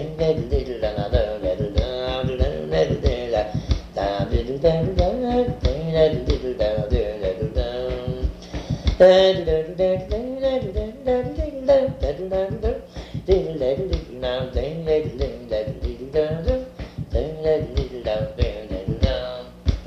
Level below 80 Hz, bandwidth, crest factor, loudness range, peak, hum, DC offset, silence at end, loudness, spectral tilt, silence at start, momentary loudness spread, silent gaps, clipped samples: -30 dBFS; 8 kHz; 18 dB; 5 LU; -4 dBFS; none; under 0.1%; 0 s; -23 LUFS; -7.5 dB/octave; 0 s; 9 LU; none; under 0.1%